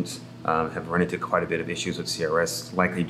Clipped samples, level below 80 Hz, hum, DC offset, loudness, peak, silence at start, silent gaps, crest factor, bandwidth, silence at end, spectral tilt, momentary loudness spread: under 0.1%; -60 dBFS; none; under 0.1%; -26 LUFS; -6 dBFS; 0 s; none; 20 dB; 15 kHz; 0 s; -4.5 dB/octave; 4 LU